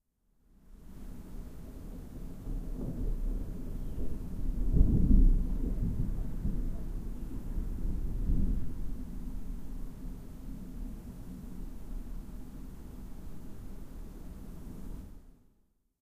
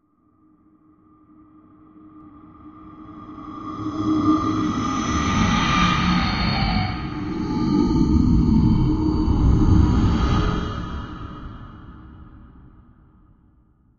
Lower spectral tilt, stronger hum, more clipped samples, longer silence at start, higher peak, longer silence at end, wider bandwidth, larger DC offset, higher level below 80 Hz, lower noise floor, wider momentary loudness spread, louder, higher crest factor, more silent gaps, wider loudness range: first, -9 dB/octave vs -6.5 dB/octave; neither; neither; second, 0.7 s vs 2.05 s; second, -10 dBFS vs -4 dBFS; second, 0.7 s vs 1.6 s; second, 2.3 kHz vs 7.4 kHz; neither; second, -34 dBFS vs -28 dBFS; first, -71 dBFS vs -59 dBFS; second, 17 LU vs 21 LU; second, -38 LUFS vs -20 LUFS; about the same, 22 dB vs 18 dB; neither; about the same, 15 LU vs 13 LU